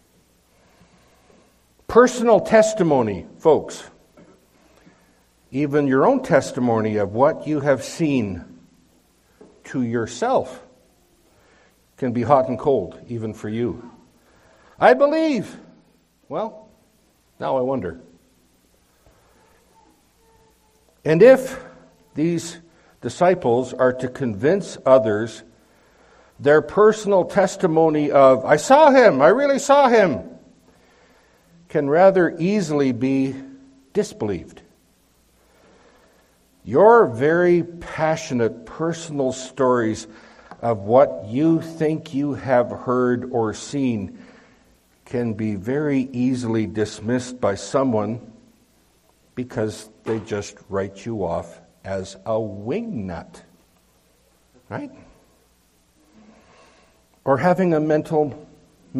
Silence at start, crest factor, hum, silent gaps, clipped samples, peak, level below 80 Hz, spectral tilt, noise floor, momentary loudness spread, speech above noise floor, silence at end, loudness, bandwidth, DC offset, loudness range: 1.9 s; 20 dB; none; none; under 0.1%; 0 dBFS; -58 dBFS; -6 dB/octave; -60 dBFS; 16 LU; 41 dB; 0 s; -19 LUFS; 13.5 kHz; under 0.1%; 13 LU